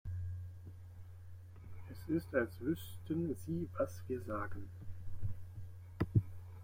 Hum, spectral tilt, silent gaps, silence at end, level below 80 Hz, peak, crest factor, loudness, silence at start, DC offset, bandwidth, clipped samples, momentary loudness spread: none; -8 dB/octave; none; 0 s; -58 dBFS; -18 dBFS; 22 dB; -41 LUFS; 0.05 s; under 0.1%; 16.5 kHz; under 0.1%; 18 LU